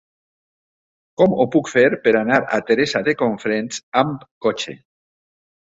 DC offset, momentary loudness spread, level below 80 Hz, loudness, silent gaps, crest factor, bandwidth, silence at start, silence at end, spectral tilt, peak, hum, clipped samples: under 0.1%; 8 LU; -60 dBFS; -18 LUFS; 3.83-3.92 s, 4.31-4.41 s; 18 dB; 8 kHz; 1.2 s; 1 s; -5 dB/octave; -2 dBFS; none; under 0.1%